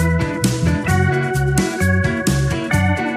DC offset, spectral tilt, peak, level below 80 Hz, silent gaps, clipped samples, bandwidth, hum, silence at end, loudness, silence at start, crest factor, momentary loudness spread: under 0.1%; -5.5 dB/octave; -2 dBFS; -32 dBFS; none; under 0.1%; 15.5 kHz; none; 0 s; -18 LUFS; 0 s; 14 dB; 2 LU